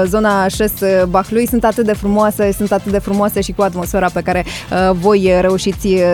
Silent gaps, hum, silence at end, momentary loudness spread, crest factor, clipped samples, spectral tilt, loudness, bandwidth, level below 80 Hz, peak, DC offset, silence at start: none; none; 0 s; 5 LU; 12 dB; under 0.1%; -5.5 dB/octave; -14 LUFS; 17 kHz; -32 dBFS; 0 dBFS; under 0.1%; 0 s